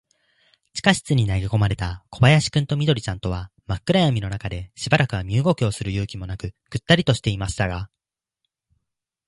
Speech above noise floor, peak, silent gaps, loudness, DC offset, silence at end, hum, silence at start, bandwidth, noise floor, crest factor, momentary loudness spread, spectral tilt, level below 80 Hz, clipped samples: 59 dB; 0 dBFS; none; -22 LUFS; under 0.1%; 1.4 s; none; 0.75 s; 11.5 kHz; -80 dBFS; 22 dB; 14 LU; -5.5 dB/octave; -40 dBFS; under 0.1%